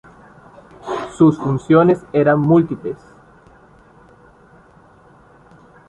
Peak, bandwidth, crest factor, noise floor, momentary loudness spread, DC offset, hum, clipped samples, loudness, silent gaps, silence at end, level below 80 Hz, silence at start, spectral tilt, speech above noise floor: -2 dBFS; 8.8 kHz; 18 dB; -48 dBFS; 16 LU; under 0.1%; none; under 0.1%; -16 LUFS; none; 2.95 s; -52 dBFS; 0.85 s; -8.5 dB/octave; 34 dB